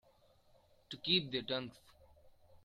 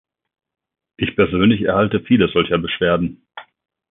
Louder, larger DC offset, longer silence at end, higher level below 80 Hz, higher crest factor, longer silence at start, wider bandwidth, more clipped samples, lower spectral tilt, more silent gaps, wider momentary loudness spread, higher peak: second, -36 LUFS vs -17 LUFS; neither; second, 0.1 s vs 0.5 s; second, -72 dBFS vs -44 dBFS; first, 24 dB vs 16 dB; about the same, 0.9 s vs 1 s; first, 14 kHz vs 3.9 kHz; neither; second, -5.5 dB/octave vs -11.5 dB/octave; neither; first, 19 LU vs 9 LU; second, -18 dBFS vs -2 dBFS